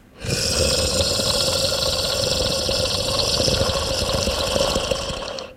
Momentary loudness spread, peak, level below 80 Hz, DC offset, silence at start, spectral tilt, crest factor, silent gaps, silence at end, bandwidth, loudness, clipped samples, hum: 4 LU; -4 dBFS; -34 dBFS; under 0.1%; 0.15 s; -2.5 dB/octave; 18 dB; none; 0 s; 16 kHz; -20 LUFS; under 0.1%; none